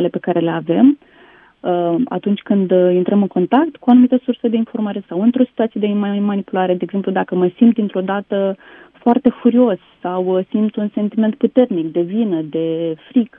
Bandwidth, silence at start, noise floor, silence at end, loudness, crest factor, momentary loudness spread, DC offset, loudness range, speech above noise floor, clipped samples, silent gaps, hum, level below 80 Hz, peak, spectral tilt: 3.7 kHz; 0 s; -47 dBFS; 0.1 s; -16 LUFS; 16 dB; 8 LU; under 0.1%; 3 LU; 31 dB; under 0.1%; none; none; -64 dBFS; 0 dBFS; -11 dB/octave